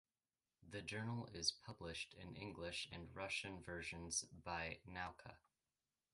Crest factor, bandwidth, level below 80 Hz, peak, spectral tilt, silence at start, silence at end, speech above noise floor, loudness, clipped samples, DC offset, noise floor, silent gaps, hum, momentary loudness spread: 26 dB; 11.5 kHz; -68 dBFS; -24 dBFS; -2.5 dB/octave; 0.6 s; 0.75 s; over 41 dB; -48 LUFS; under 0.1%; under 0.1%; under -90 dBFS; none; none; 10 LU